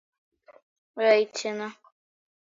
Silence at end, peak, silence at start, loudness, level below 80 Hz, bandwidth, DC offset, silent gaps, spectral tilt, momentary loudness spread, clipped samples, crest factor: 0.8 s; -8 dBFS; 0.95 s; -25 LUFS; -86 dBFS; 7.8 kHz; under 0.1%; none; -3 dB/octave; 17 LU; under 0.1%; 22 dB